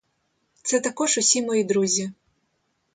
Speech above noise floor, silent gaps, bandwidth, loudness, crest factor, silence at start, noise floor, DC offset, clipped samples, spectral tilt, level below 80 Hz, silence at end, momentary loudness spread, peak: 50 dB; none; 9.6 kHz; -22 LUFS; 22 dB; 0.65 s; -72 dBFS; under 0.1%; under 0.1%; -2.5 dB/octave; -72 dBFS; 0.8 s; 8 LU; -4 dBFS